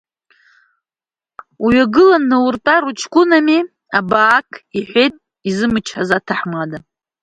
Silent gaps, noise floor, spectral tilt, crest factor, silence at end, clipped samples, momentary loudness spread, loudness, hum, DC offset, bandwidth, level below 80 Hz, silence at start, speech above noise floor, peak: none; under -90 dBFS; -5 dB/octave; 16 dB; 0.45 s; under 0.1%; 13 LU; -14 LUFS; none; under 0.1%; 9.4 kHz; -50 dBFS; 1.6 s; over 76 dB; 0 dBFS